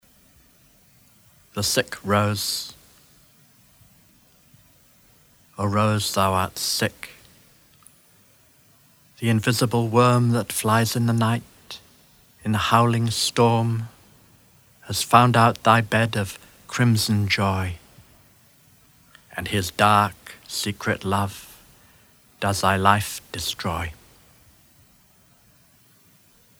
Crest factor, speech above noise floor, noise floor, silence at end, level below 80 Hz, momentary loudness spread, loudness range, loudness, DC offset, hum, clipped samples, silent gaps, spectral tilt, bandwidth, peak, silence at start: 24 dB; 36 dB; -57 dBFS; 2.65 s; -54 dBFS; 16 LU; 8 LU; -21 LUFS; under 0.1%; none; under 0.1%; none; -4.5 dB/octave; over 20 kHz; 0 dBFS; 1.55 s